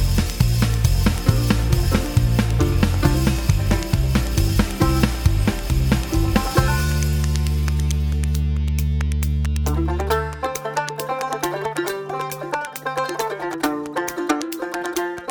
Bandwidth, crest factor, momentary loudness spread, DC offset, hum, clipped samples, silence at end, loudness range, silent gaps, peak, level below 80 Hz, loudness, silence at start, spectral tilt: over 20 kHz; 18 dB; 7 LU; under 0.1%; none; under 0.1%; 0 s; 6 LU; none; -2 dBFS; -24 dBFS; -21 LUFS; 0 s; -5.5 dB/octave